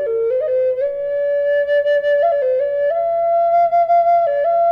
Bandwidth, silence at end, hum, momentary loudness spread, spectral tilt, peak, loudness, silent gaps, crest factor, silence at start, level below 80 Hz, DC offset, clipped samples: 5.6 kHz; 0 s; none; 5 LU; -4.5 dB/octave; -8 dBFS; -16 LUFS; none; 8 dB; 0 s; -58 dBFS; under 0.1%; under 0.1%